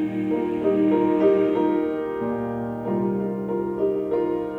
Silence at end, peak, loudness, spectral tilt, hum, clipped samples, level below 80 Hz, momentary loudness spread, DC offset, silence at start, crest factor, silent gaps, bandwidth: 0 s; -8 dBFS; -23 LUFS; -9.5 dB/octave; none; under 0.1%; -56 dBFS; 8 LU; under 0.1%; 0 s; 16 dB; none; 4.2 kHz